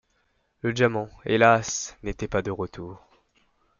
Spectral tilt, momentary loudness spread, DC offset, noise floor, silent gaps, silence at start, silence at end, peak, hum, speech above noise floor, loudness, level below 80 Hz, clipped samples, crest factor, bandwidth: -4.5 dB/octave; 15 LU; under 0.1%; -70 dBFS; none; 0.65 s; 0.85 s; -4 dBFS; none; 45 dB; -25 LUFS; -50 dBFS; under 0.1%; 24 dB; 7.4 kHz